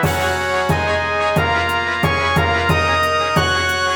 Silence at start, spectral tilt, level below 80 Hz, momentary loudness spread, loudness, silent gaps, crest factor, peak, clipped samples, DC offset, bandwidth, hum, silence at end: 0 s; -4.5 dB/octave; -40 dBFS; 2 LU; -16 LUFS; none; 16 dB; -2 dBFS; under 0.1%; under 0.1%; 19.5 kHz; none; 0 s